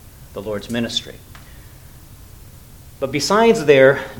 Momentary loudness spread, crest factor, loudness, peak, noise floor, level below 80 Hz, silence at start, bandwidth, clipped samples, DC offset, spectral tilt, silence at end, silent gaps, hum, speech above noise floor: 20 LU; 20 dB; -16 LUFS; 0 dBFS; -41 dBFS; -44 dBFS; 0.2 s; 19 kHz; under 0.1%; under 0.1%; -4.5 dB/octave; 0 s; none; none; 25 dB